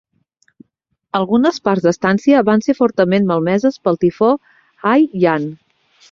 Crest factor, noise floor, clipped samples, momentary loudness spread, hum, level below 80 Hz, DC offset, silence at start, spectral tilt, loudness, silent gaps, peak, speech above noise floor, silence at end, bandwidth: 14 dB; -69 dBFS; under 0.1%; 8 LU; none; -56 dBFS; under 0.1%; 1.15 s; -7 dB/octave; -15 LUFS; none; -2 dBFS; 55 dB; 0.55 s; 7.4 kHz